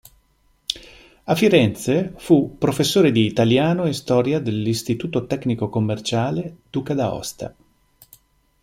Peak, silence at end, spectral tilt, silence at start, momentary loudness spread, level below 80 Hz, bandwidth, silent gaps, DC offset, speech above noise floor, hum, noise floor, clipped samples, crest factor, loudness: 0 dBFS; 1.15 s; -6 dB/octave; 0.7 s; 13 LU; -52 dBFS; 16.5 kHz; none; under 0.1%; 42 dB; none; -61 dBFS; under 0.1%; 20 dB; -20 LUFS